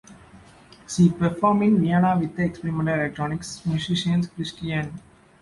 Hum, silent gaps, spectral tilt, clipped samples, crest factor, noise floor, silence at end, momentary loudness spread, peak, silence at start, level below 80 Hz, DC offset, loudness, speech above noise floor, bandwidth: none; none; -6.5 dB/octave; under 0.1%; 16 dB; -49 dBFS; 0.45 s; 11 LU; -6 dBFS; 0.1 s; -52 dBFS; under 0.1%; -23 LUFS; 27 dB; 11.5 kHz